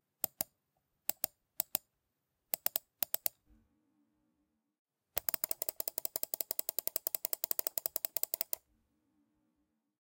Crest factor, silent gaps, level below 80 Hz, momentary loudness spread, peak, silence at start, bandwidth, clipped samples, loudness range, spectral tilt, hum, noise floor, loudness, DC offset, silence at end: 32 dB; 4.79-4.85 s; -78 dBFS; 6 LU; -10 dBFS; 0.4 s; 17.5 kHz; under 0.1%; 4 LU; 0 dB/octave; none; -85 dBFS; -36 LUFS; under 0.1%; 1.6 s